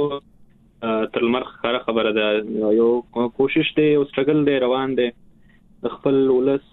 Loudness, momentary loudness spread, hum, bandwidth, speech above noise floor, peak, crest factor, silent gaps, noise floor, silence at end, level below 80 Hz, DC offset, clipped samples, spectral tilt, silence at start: -20 LUFS; 8 LU; none; 4.1 kHz; 32 dB; -6 dBFS; 16 dB; none; -51 dBFS; 0.15 s; -56 dBFS; under 0.1%; under 0.1%; -9.5 dB/octave; 0 s